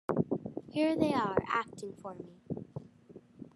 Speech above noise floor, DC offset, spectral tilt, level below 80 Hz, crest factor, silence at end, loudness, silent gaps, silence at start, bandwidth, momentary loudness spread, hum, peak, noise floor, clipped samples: 23 dB; under 0.1%; -7 dB/octave; -68 dBFS; 22 dB; 0.1 s; -34 LUFS; none; 0.1 s; 12 kHz; 19 LU; none; -14 dBFS; -56 dBFS; under 0.1%